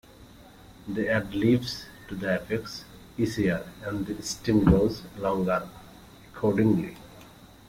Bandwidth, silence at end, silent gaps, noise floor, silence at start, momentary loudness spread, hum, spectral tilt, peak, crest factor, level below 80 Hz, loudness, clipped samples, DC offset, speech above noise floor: 16.5 kHz; 0.25 s; none; -50 dBFS; 0.2 s; 17 LU; none; -6.5 dB/octave; -6 dBFS; 22 dB; -46 dBFS; -27 LUFS; under 0.1%; under 0.1%; 24 dB